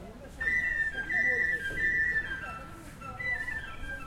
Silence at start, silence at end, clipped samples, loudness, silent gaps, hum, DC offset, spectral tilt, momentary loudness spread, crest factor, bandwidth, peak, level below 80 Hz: 0 s; 0 s; under 0.1%; -29 LUFS; none; none; under 0.1%; -4 dB/octave; 17 LU; 14 dB; 16 kHz; -18 dBFS; -48 dBFS